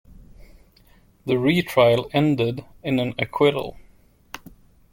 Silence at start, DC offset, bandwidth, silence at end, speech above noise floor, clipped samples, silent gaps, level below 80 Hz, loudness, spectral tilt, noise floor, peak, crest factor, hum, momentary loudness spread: 0.1 s; under 0.1%; 17 kHz; 0.55 s; 34 dB; under 0.1%; none; -52 dBFS; -21 LUFS; -6.5 dB/octave; -55 dBFS; -4 dBFS; 20 dB; none; 22 LU